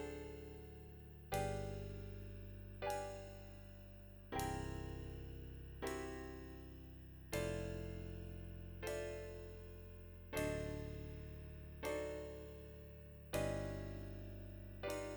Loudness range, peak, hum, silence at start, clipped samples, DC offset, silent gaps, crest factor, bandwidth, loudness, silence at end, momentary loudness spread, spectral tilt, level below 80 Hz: 1 LU; -28 dBFS; none; 0 s; under 0.1%; under 0.1%; none; 20 dB; over 20 kHz; -48 LUFS; 0 s; 13 LU; -5.5 dB/octave; -56 dBFS